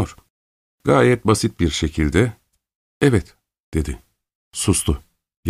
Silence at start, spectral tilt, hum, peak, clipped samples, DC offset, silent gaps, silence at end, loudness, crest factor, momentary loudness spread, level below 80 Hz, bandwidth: 0 s; -5 dB/octave; none; 0 dBFS; under 0.1%; under 0.1%; 0.30-0.78 s, 2.75-3.01 s, 3.63-3.72 s, 4.35-4.51 s, 5.37-5.43 s; 0 s; -20 LUFS; 20 dB; 13 LU; -34 dBFS; 15 kHz